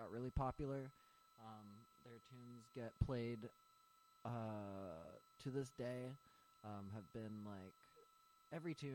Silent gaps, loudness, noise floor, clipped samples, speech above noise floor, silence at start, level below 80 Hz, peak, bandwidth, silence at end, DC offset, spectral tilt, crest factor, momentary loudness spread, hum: none; -51 LUFS; -73 dBFS; under 0.1%; 23 dB; 0 s; -62 dBFS; -26 dBFS; 16 kHz; 0 s; under 0.1%; -7.5 dB/octave; 26 dB; 17 LU; none